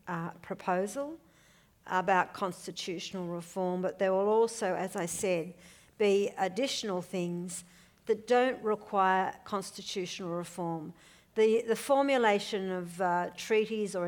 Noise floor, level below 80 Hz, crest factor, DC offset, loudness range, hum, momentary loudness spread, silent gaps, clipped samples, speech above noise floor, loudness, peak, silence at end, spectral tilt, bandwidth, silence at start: -63 dBFS; -72 dBFS; 18 dB; under 0.1%; 3 LU; none; 11 LU; none; under 0.1%; 32 dB; -31 LUFS; -12 dBFS; 0 s; -4.5 dB/octave; over 20 kHz; 0.05 s